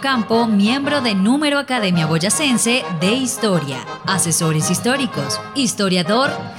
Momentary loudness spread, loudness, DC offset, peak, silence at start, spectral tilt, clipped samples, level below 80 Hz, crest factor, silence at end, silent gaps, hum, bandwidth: 5 LU; -17 LUFS; under 0.1%; -4 dBFS; 0 s; -4 dB/octave; under 0.1%; -58 dBFS; 14 dB; 0 s; none; none; 16.5 kHz